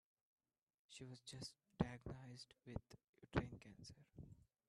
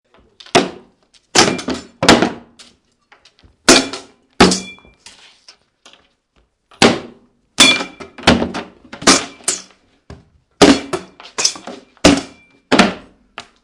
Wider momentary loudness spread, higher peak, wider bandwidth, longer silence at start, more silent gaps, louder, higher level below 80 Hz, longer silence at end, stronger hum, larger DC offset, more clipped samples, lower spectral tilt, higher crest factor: second, 16 LU vs 20 LU; second, -24 dBFS vs 0 dBFS; about the same, 12.5 kHz vs 12 kHz; first, 0.9 s vs 0.55 s; first, 3.09-3.13 s vs none; second, -52 LUFS vs -13 LUFS; second, -66 dBFS vs -42 dBFS; about the same, 0.3 s vs 0.25 s; neither; neither; second, under 0.1% vs 0.2%; first, -6 dB/octave vs -2.5 dB/octave; first, 28 dB vs 18 dB